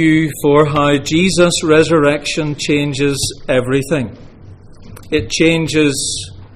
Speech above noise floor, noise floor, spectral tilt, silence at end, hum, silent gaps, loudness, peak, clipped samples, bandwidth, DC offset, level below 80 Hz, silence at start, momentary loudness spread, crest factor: 23 dB; -37 dBFS; -4.5 dB/octave; 0 s; none; none; -14 LUFS; 0 dBFS; under 0.1%; 15.5 kHz; under 0.1%; -38 dBFS; 0 s; 8 LU; 14 dB